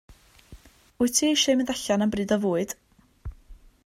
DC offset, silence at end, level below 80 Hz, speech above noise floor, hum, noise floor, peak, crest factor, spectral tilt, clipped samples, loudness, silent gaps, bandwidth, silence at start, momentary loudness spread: under 0.1%; 0.3 s; -50 dBFS; 27 dB; none; -51 dBFS; -8 dBFS; 20 dB; -3.5 dB/octave; under 0.1%; -24 LUFS; none; 16 kHz; 0.1 s; 23 LU